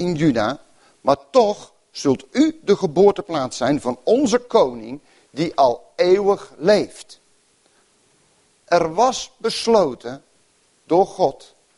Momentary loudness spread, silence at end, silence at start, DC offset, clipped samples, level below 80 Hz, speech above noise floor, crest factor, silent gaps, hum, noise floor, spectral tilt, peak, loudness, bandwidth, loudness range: 16 LU; 0.45 s; 0 s; under 0.1%; under 0.1%; -56 dBFS; 41 dB; 18 dB; none; none; -60 dBFS; -5 dB/octave; -2 dBFS; -19 LUFS; 11.5 kHz; 3 LU